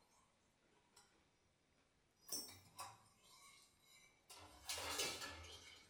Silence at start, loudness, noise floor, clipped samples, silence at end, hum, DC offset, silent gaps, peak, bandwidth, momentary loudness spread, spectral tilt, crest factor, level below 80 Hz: 0 s; -48 LUFS; -79 dBFS; under 0.1%; 0 s; none; under 0.1%; none; -28 dBFS; over 20 kHz; 24 LU; -0.5 dB/octave; 26 dB; -76 dBFS